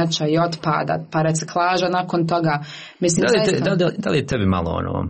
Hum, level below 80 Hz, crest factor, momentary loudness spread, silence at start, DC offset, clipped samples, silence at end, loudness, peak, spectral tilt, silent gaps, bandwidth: none; -46 dBFS; 14 dB; 5 LU; 0 s; under 0.1%; under 0.1%; 0 s; -20 LUFS; -6 dBFS; -5 dB/octave; none; 8.8 kHz